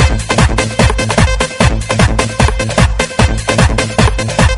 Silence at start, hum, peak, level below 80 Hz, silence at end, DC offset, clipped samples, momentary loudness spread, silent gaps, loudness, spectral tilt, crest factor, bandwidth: 0 s; none; 0 dBFS; -16 dBFS; 0 s; under 0.1%; 0.2%; 1 LU; none; -12 LUFS; -4.5 dB/octave; 12 dB; 11.5 kHz